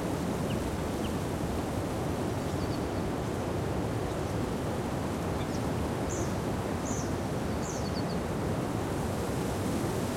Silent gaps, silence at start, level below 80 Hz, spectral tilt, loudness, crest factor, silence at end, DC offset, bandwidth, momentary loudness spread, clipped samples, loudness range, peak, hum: none; 0 s; -44 dBFS; -6 dB/octave; -33 LUFS; 14 dB; 0 s; under 0.1%; 16.5 kHz; 1 LU; under 0.1%; 0 LU; -18 dBFS; none